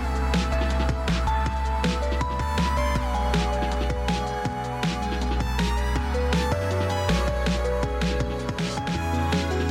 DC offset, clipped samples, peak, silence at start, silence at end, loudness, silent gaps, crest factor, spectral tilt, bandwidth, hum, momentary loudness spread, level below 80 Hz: under 0.1%; under 0.1%; -10 dBFS; 0 s; 0 s; -25 LUFS; none; 14 dB; -5.5 dB/octave; 14 kHz; none; 3 LU; -28 dBFS